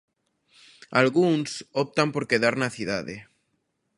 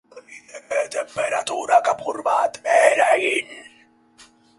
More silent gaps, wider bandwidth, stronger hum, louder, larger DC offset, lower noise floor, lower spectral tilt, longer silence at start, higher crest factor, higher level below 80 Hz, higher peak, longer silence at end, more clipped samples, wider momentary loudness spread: neither; about the same, 11.5 kHz vs 11.5 kHz; neither; second, -24 LUFS vs -20 LUFS; neither; first, -75 dBFS vs -55 dBFS; first, -5 dB/octave vs -1.5 dB/octave; first, 0.9 s vs 0.15 s; about the same, 24 dB vs 20 dB; first, -64 dBFS vs -70 dBFS; second, -4 dBFS vs 0 dBFS; second, 0.75 s vs 0.95 s; neither; second, 10 LU vs 18 LU